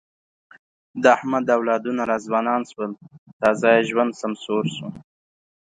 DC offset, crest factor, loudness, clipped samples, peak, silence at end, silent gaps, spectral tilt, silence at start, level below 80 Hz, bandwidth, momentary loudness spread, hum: under 0.1%; 20 dB; -21 LUFS; under 0.1%; -2 dBFS; 0.6 s; 3.18-3.26 s, 3.33-3.40 s; -5.5 dB/octave; 0.95 s; -66 dBFS; 9.4 kHz; 14 LU; none